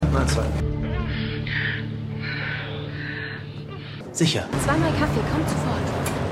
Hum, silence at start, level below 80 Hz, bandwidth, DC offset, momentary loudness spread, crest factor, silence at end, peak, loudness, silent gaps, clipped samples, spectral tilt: none; 0 s; -34 dBFS; 15.5 kHz; under 0.1%; 10 LU; 18 dB; 0 s; -6 dBFS; -25 LUFS; none; under 0.1%; -5.5 dB/octave